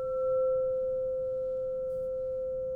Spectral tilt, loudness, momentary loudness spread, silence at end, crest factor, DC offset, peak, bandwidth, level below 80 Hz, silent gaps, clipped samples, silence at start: -9 dB/octave; -32 LUFS; 6 LU; 0 s; 8 dB; under 0.1%; -22 dBFS; 1.4 kHz; -56 dBFS; none; under 0.1%; 0 s